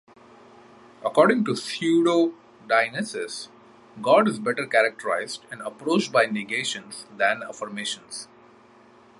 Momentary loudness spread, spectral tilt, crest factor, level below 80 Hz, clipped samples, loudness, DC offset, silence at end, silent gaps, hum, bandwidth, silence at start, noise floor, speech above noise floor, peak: 15 LU; -4 dB/octave; 22 dB; -74 dBFS; under 0.1%; -24 LUFS; under 0.1%; 0.95 s; none; none; 11.5 kHz; 1 s; -53 dBFS; 29 dB; -4 dBFS